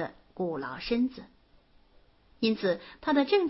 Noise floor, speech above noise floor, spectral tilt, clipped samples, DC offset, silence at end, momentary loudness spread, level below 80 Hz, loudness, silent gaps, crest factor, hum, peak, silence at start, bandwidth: -61 dBFS; 33 dB; -8.5 dB/octave; under 0.1%; under 0.1%; 0 s; 8 LU; -58 dBFS; -30 LUFS; none; 18 dB; none; -12 dBFS; 0 s; 6 kHz